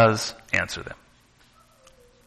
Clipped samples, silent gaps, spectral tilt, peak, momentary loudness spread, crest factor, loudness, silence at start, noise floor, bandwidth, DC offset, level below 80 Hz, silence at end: under 0.1%; none; -4.5 dB/octave; -6 dBFS; 19 LU; 20 dB; -25 LUFS; 0 s; -58 dBFS; 13 kHz; under 0.1%; -56 dBFS; 1.3 s